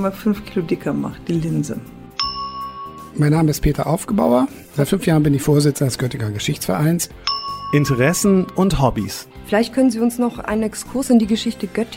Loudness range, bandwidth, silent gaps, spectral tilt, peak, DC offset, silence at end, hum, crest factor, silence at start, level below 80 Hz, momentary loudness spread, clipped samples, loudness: 4 LU; 16.5 kHz; none; -5.5 dB/octave; -4 dBFS; under 0.1%; 0 s; none; 16 dB; 0 s; -38 dBFS; 9 LU; under 0.1%; -19 LUFS